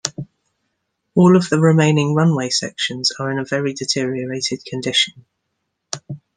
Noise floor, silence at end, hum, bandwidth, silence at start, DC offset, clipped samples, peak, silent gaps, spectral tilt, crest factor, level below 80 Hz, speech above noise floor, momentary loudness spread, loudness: -74 dBFS; 0.2 s; none; 10 kHz; 0.05 s; under 0.1%; under 0.1%; 0 dBFS; none; -5 dB/octave; 18 dB; -62 dBFS; 57 dB; 16 LU; -17 LUFS